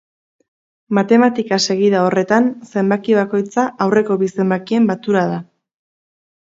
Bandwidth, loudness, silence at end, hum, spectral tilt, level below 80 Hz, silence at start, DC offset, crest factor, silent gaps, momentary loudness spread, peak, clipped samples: 7.8 kHz; -16 LUFS; 1.05 s; none; -5.5 dB/octave; -66 dBFS; 0.9 s; under 0.1%; 16 dB; none; 6 LU; 0 dBFS; under 0.1%